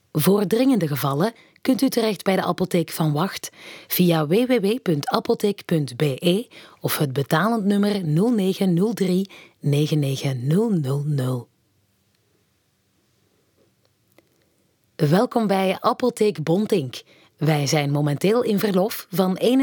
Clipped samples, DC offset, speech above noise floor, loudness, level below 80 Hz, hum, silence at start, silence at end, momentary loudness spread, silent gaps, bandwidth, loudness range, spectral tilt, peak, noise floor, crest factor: under 0.1%; under 0.1%; 46 dB; -21 LUFS; -70 dBFS; none; 0.15 s; 0 s; 7 LU; none; 19.5 kHz; 5 LU; -6 dB/octave; -4 dBFS; -66 dBFS; 18 dB